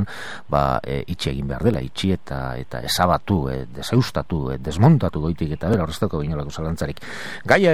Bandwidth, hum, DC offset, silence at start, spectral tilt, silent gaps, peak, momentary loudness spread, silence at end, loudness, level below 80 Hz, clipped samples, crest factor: 15.5 kHz; none; 2%; 0 s; -6 dB/octave; none; 0 dBFS; 11 LU; 0 s; -22 LUFS; -38 dBFS; under 0.1%; 20 dB